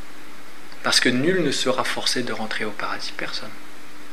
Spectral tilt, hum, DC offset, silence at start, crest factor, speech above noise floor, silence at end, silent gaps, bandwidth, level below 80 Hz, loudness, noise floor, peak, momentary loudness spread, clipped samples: -3 dB/octave; none; 5%; 0 s; 24 dB; 20 dB; 0 s; none; 15.5 kHz; -70 dBFS; -23 LUFS; -44 dBFS; -2 dBFS; 24 LU; under 0.1%